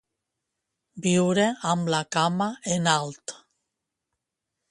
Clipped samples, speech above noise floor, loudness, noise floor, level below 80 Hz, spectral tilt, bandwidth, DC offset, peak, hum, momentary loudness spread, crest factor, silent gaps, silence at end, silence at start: under 0.1%; 60 dB; -24 LUFS; -84 dBFS; -66 dBFS; -4.5 dB/octave; 11.5 kHz; under 0.1%; -6 dBFS; none; 10 LU; 20 dB; none; 1.35 s; 0.95 s